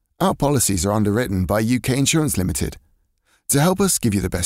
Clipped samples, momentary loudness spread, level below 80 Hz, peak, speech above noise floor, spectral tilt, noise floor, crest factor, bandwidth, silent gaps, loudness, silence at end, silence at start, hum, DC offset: under 0.1%; 5 LU; -38 dBFS; -6 dBFS; 45 dB; -4.5 dB/octave; -63 dBFS; 14 dB; 16 kHz; none; -19 LUFS; 0 s; 0.2 s; none; under 0.1%